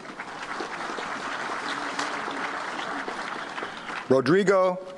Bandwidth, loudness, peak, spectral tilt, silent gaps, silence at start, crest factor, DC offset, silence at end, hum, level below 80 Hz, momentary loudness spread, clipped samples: 11.5 kHz; -28 LUFS; -8 dBFS; -5 dB/octave; none; 0 s; 20 dB; under 0.1%; 0 s; none; -66 dBFS; 13 LU; under 0.1%